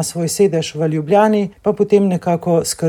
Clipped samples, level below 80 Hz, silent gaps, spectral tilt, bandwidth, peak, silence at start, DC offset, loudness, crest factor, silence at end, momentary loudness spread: under 0.1%; -52 dBFS; none; -5.5 dB/octave; 18.5 kHz; -2 dBFS; 0 s; under 0.1%; -16 LUFS; 14 dB; 0 s; 6 LU